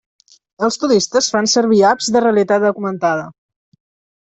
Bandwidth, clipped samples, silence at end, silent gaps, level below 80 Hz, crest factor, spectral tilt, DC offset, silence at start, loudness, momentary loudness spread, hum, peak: 8.4 kHz; under 0.1%; 0.9 s; none; -60 dBFS; 14 dB; -3.5 dB/octave; under 0.1%; 0.6 s; -15 LUFS; 8 LU; none; -2 dBFS